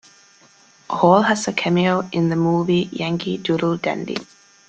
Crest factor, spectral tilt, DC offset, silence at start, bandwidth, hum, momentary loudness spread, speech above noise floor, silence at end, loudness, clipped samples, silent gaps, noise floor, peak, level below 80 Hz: 18 dB; -6 dB/octave; under 0.1%; 0.9 s; 9 kHz; none; 10 LU; 33 dB; 0.45 s; -19 LUFS; under 0.1%; none; -52 dBFS; -2 dBFS; -58 dBFS